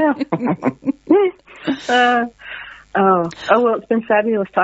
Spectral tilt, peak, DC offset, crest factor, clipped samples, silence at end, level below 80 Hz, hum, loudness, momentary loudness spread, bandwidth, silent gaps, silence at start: -3.5 dB/octave; 0 dBFS; under 0.1%; 16 dB; under 0.1%; 0 s; -58 dBFS; none; -17 LUFS; 11 LU; 8 kHz; none; 0 s